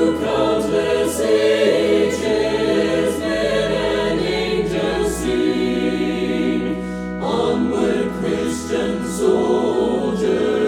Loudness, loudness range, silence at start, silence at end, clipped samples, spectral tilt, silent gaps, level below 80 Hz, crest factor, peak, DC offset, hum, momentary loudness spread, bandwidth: -19 LUFS; 3 LU; 0 s; 0 s; under 0.1%; -5 dB/octave; none; -40 dBFS; 14 dB; -4 dBFS; under 0.1%; none; 5 LU; 16 kHz